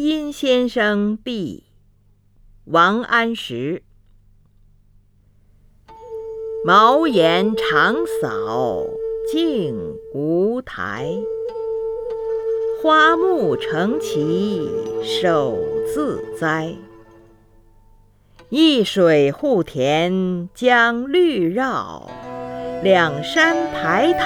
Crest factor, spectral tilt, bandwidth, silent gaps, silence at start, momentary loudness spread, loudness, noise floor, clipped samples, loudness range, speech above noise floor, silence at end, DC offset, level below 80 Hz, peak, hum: 18 dB; -5.5 dB/octave; 17.5 kHz; none; 0 s; 13 LU; -18 LUFS; -55 dBFS; under 0.1%; 6 LU; 37 dB; 0 s; under 0.1%; -52 dBFS; 0 dBFS; none